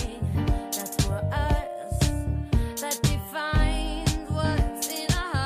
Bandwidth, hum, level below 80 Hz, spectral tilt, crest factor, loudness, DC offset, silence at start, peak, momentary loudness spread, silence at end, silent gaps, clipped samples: 16 kHz; none; -30 dBFS; -5 dB/octave; 16 dB; -27 LUFS; under 0.1%; 0 s; -10 dBFS; 4 LU; 0 s; none; under 0.1%